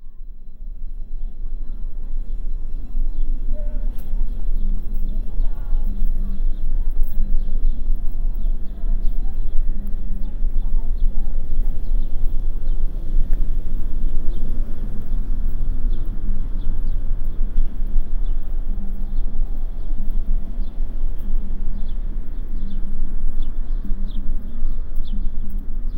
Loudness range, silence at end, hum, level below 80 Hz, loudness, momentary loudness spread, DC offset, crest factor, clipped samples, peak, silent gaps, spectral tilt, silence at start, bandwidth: 3 LU; 0 s; none; -18 dBFS; -29 LUFS; 5 LU; under 0.1%; 12 dB; under 0.1%; -2 dBFS; none; -9 dB/octave; 0 s; 0.9 kHz